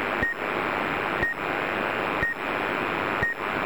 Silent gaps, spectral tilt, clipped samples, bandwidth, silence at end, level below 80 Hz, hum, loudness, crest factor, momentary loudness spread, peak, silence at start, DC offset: none; -5.5 dB/octave; under 0.1%; over 20 kHz; 0 s; -48 dBFS; none; -26 LUFS; 16 dB; 1 LU; -12 dBFS; 0 s; 0.5%